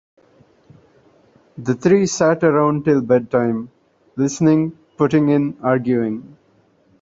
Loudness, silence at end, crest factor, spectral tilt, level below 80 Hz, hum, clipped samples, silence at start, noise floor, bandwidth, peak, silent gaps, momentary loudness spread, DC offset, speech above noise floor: -17 LUFS; 0.75 s; 16 dB; -6.5 dB/octave; -56 dBFS; none; under 0.1%; 1.55 s; -57 dBFS; 7.8 kHz; -2 dBFS; none; 11 LU; under 0.1%; 40 dB